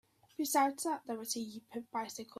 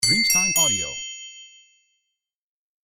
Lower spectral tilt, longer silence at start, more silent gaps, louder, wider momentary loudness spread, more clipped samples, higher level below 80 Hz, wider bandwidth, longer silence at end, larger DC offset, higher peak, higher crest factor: first, -2 dB/octave vs 0 dB/octave; first, 0.4 s vs 0 s; neither; second, -37 LUFS vs -18 LUFS; second, 13 LU vs 20 LU; neither; second, -82 dBFS vs -54 dBFS; about the same, 16 kHz vs 16.5 kHz; second, 0.15 s vs 1.4 s; neither; second, -18 dBFS vs -6 dBFS; about the same, 20 dB vs 18 dB